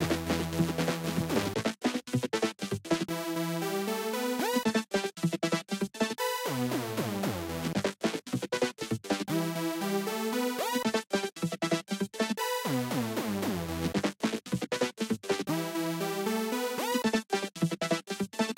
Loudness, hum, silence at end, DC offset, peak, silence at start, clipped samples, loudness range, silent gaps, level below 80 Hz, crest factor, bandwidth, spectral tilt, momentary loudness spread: -32 LUFS; none; 0.05 s; under 0.1%; -14 dBFS; 0 s; under 0.1%; 1 LU; none; -58 dBFS; 16 dB; 16 kHz; -4.5 dB/octave; 4 LU